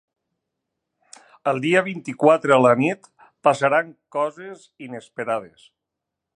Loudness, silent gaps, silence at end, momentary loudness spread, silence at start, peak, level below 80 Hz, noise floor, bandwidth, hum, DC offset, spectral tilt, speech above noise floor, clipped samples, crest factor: -20 LUFS; none; 0.9 s; 21 LU; 1.45 s; -2 dBFS; -74 dBFS; -83 dBFS; 10.5 kHz; none; under 0.1%; -6 dB/octave; 63 dB; under 0.1%; 22 dB